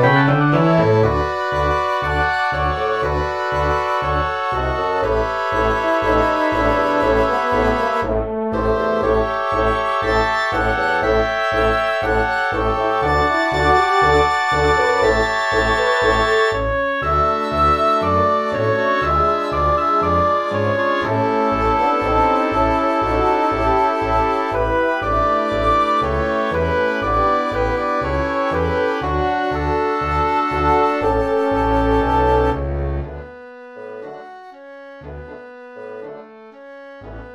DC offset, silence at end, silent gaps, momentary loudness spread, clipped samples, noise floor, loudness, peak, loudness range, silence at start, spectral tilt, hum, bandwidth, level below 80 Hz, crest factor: under 0.1%; 0 s; none; 8 LU; under 0.1%; -39 dBFS; -17 LUFS; -2 dBFS; 3 LU; 0 s; -6 dB/octave; none; 13 kHz; -30 dBFS; 16 dB